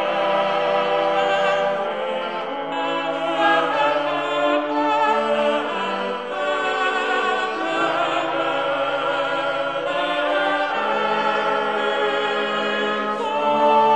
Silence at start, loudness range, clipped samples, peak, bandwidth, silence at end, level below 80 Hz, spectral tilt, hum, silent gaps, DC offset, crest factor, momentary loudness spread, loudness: 0 s; 2 LU; under 0.1%; -6 dBFS; 9.6 kHz; 0 s; -66 dBFS; -4 dB/octave; none; none; 0.3%; 14 dB; 5 LU; -21 LUFS